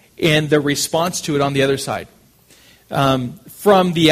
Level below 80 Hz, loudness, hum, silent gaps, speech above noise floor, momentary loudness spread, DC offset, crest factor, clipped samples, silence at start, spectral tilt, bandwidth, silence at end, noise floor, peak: -48 dBFS; -17 LUFS; none; none; 34 dB; 11 LU; under 0.1%; 18 dB; under 0.1%; 0.2 s; -4.5 dB/octave; 15.5 kHz; 0 s; -50 dBFS; 0 dBFS